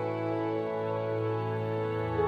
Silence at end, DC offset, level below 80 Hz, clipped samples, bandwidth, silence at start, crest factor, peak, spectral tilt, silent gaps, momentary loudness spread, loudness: 0 s; under 0.1%; -54 dBFS; under 0.1%; 6.4 kHz; 0 s; 14 dB; -18 dBFS; -9 dB/octave; none; 1 LU; -32 LUFS